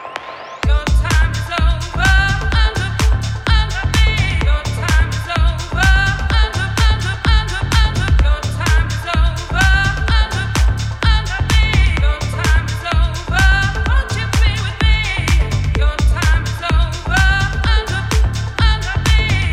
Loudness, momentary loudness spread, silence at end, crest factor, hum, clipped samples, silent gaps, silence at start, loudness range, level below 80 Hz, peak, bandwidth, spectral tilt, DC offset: -16 LUFS; 4 LU; 0 s; 14 dB; none; under 0.1%; none; 0 s; 1 LU; -16 dBFS; 0 dBFS; 13 kHz; -4.5 dB/octave; under 0.1%